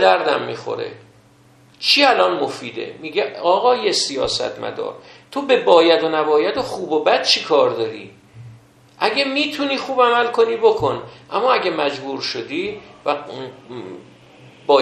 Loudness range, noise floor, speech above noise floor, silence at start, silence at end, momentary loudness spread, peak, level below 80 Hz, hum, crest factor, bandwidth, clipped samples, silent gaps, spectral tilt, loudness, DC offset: 4 LU; -51 dBFS; 32 dB; 0 s; 0 s; 16 LU; 0 dBFS; -58 dBFS; none; 18 dB; 12.5 kHz; under 0.1%; none; -3 dB/octave; -18 LUFS; under 0.1%